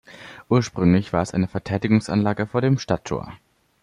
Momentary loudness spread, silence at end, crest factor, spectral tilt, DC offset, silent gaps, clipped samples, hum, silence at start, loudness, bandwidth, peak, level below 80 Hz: 11 LU; 0.45 s; 18 dB; -7 dB/octave; under 0.1%; none; under 0.1%; none; 0.1 s; -22 LUFS; 11 kHz; -4 dBFS; -50 dBFS